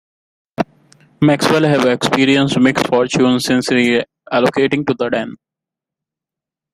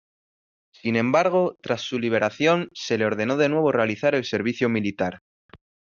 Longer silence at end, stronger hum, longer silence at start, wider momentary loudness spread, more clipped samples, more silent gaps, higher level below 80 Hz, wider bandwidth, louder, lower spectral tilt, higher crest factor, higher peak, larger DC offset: first, 1.4 s vs 0.4 s; neither; second, 0.6 s vs 0.85 s; first, 11 LU vs 7 LU; neither; second, none vs 5.21-5.49 s; first, -54 dBFS vs -66 dBFS; first, 14.5 kHz vs 7.4 kHz; first, -15 LUFS vs -23 LUFS; about the same, -5 dB/octave vs -4.5 dB/octave; about the same, 16 dB vs 18 dB; first, 0 dBFS vs -6 dBFS; neither